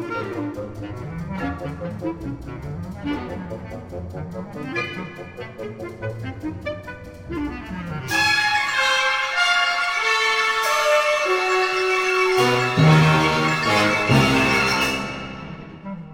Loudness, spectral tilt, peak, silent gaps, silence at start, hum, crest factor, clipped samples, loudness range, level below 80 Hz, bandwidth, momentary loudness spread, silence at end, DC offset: -20 LUFS; -4.5 dB/octave; -2 dBFS; none; 0 s; none; 18 dB; under 0.1%; 14 LU; -46 dBFS; 16.5 kHz; 17 LU; 0 s; under 0.1%